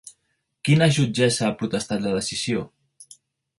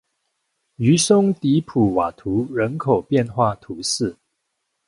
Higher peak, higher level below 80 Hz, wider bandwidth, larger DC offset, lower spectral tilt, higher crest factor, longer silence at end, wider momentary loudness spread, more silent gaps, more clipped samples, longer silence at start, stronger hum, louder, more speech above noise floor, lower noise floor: about the same, -6 dBFS vs -4 dBFS; about the same, -56 dBFS vs -52 dBFS; about the same, 11.5 kHz vs 11.5 kHz; neither; about the same, -5 dB/octave vs -5.5 dB/octave; about the same, 18 dB vs 18 dB; second, 0.55 s vs 0.75 s; about the same, 10 LU vs 8 LU; neither; neither; second, 0.05 s vs 0.8 s; neither; about the same, -22 LUFS vs -20 LUFS; second, 52 dB vs 56 dB; about the same, -73 dBFS vs -75 dBFS